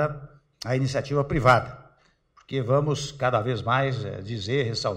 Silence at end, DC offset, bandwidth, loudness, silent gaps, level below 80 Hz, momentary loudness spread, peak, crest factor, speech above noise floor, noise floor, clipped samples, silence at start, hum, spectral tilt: 0 s; under 0.1%; 10.5 kHz; -25 LUFS; none; -48 dBFS; 12 LU; -6 dBFS; 20 dB; 38 dB; -62 dBFS; under 0.1%; 0 s; none; -6 dB/octave